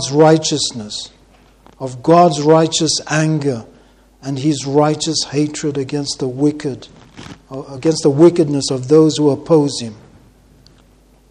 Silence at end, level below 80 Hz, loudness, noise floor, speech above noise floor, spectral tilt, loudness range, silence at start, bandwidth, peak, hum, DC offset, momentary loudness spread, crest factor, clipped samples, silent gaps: 1.35 s; -52 dBFS; -15 LUFS; -49 dBFS; 34 dB; -5 dB/octave; 4 LU; 0 s; 10.5 kHz; 0 dBFS; none; under 0.1%; 19 LU; 16 dB; under 0.1%; none